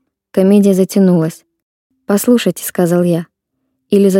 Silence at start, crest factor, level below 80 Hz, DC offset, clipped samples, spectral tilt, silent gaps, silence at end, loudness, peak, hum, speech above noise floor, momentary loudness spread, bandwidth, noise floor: 0.35 s; 12 dB; -62 dBFS; under 0.1%; under 0.1%; -6.5 dB/octave; 1.62-1.90 s; 0 s; -13 LUFS; 0 dBFS; none; 59 dB; 8 LU; 17 kHz; -70 dBFS